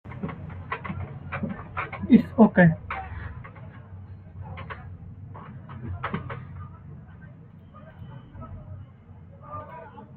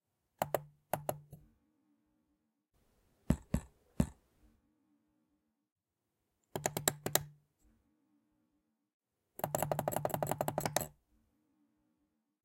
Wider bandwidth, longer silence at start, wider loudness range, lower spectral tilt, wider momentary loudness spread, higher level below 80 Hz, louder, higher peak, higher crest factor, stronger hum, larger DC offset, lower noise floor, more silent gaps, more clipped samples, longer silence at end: second, 4.4 kHz vs 17 kHz; second, 0.05 s vs 0.4 s; first, 19 LU vs 5 LU; first, -11 dB/octave vs -4 dB/octave; first, 26 LU vs 9 LU; about the same, -52 dBFS vs -56 dBFS; first, -25 LUFS vs -38 LUFS; first, -4 dBFS vs -8 dBFS; second, 24 dB vs 34 dB; neither; neither; second, -47 dBFS vs -87 dBFS; second, none vs 5.72-5.76 s, 8.94-9.00 s; neither; second, 0 s vs 1.55 s